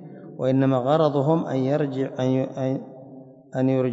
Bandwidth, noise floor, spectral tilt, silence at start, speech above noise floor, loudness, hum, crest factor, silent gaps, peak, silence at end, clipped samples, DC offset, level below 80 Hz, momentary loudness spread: 7.8 kHz; -44 dBFS; -9 dB/octave; 0 s; 22 dB; -23 LUFS; none; 16 dB; none; -6 dBFS; 0 s; under 0.1%; under 0.1%; -72 dBFS; 13 LU